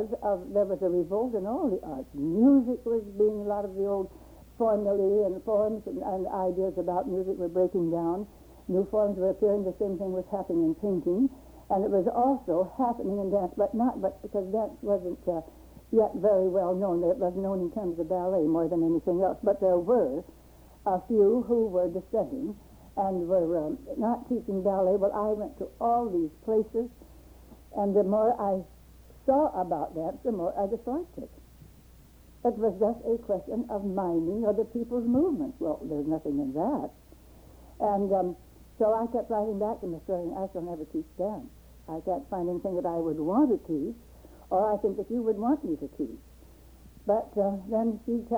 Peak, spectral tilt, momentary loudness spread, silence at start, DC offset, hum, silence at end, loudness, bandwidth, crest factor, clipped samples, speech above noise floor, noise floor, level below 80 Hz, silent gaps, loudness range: -12 dBFS; -9.5 dB/octave; 9 LU; 0 s; under 0.1%; none; 0 s; -29 LUFS; over 20 kHz; 16 dB; under 0.1%; 26 dB; -54 dBFS; -54 dBFS; none; 4 LU